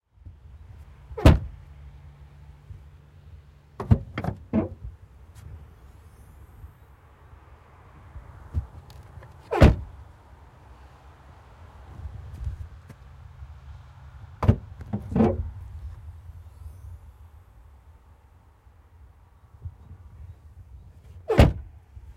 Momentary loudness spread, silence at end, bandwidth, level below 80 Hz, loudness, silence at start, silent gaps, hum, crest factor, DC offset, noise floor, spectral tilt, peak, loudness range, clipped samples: 29 LU; 0.05 s; 14 kHz; -34 dBFS; -24 LUFS; 0.55 s; none; none; 26 dB; under 0.1%; -55 dBFS; -8 dB/octave; -4 dBFS; 22 LU; under 0.1%